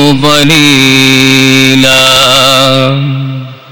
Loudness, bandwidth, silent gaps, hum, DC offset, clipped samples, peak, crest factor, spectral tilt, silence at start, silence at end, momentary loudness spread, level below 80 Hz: -4 LUFS; over 20 kHz; none; none; under 0.1%; 3%; 0 dBFS; 6 dB; -3.5 dB/octave; 0 s; 0.15 s; 10 LU; -36 dBFS